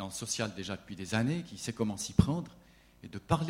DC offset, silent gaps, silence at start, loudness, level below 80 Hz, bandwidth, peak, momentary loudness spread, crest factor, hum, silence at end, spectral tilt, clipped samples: under 0.1%; none; 0 s; -34 LUFS; -50 dBFS; 16 kHz; -8 dBFS; 18 LU; 26 dB; none; 0 s; -5 dB/octave; under 0.1%